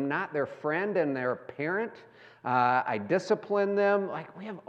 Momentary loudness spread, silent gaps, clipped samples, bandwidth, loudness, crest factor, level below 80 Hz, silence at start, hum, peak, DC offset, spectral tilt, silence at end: 11 LU; none; under 0.1%; 8.6 kHz; -29 LUFS; 18 dB; -84 dBFS; 0 s; none; -12 dBFS; under 0.1%; -6.5 dB/octave; 0.1 s